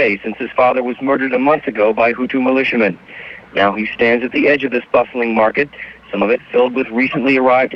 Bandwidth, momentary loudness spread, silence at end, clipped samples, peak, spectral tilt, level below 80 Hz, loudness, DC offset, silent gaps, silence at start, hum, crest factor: 6 kHz; 7 LU; 0 s; under 0.1%; -2 dBFS; -7.5 dB/octave; -52 dBFS; -15 LUFS; under 0.1%; none; 0 s; none; 14 dB